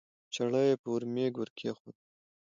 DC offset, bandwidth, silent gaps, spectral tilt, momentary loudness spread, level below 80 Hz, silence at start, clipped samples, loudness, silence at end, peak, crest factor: under 0.1%; 7.8 kHz; 0.79-0.84 s, 1.50-1.56 s, 1.80-1.85 s; -6 dB/octave; 12 LU; -80 dBFS; 0.3 s; under 0.1%; -33 LUFS; 0.5 s; -16 dBFS; 18 dB